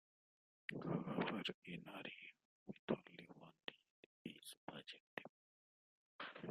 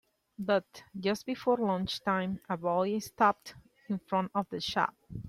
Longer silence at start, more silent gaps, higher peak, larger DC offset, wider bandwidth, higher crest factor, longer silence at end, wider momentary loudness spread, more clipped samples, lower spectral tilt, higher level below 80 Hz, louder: first, 0.7 s vs 0.4 s; first, 1.54-1.62 s, 2.45-2.66 s, 2.79-2.88 s, 3.90-4.25 s, 4.57-4.67 s, 5.00-5.17 s, 5.29-6.19 s vs none; second, -24 dBFS vs -12 dBFS; neither; about the same, 13.5 kHz vs 14.5 kHz; first, 28 dB vs 20 dB; about the same, 0 s vs 0 s; first, 16 LU vs 11 LU; neither; about the same, -5.5 dB/octave vs -5.5 dB/octave; second, -84 dBFS vs -64 dBFS; second, -50 LUFS vs -32 LUFS